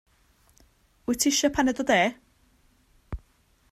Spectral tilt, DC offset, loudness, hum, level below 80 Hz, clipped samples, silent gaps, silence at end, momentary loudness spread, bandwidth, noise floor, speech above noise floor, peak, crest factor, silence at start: -2.5 dB/octave; under 0.1%; -24 LUFS; none; -50 dBFS; under 0.1%; none; 0.55 s; 20 LU; 16 kHz; -64 dBFS; 40 dB; -8 dBFS; 20 dB; 1.1 s